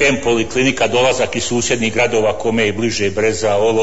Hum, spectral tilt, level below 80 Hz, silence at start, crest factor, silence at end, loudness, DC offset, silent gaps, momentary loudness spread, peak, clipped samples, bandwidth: none; -3.5 dB/octave; -42 dBFS; 0 s; 12 dB; 0 s; -16 LUFS; 3%; none; 3 LU; -4 dBFS; under 0.1%; 8 kHz